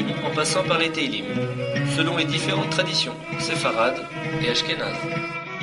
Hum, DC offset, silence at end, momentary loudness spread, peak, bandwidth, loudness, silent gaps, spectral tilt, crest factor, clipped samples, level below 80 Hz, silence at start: none; under 0.1%; 0 s; 6 LU; -6 dBFS; 11.5 kHz; -23 LUFS; none; -4 dB/octave; 18 dB; under 0.1%; -56 dBFS; 0 s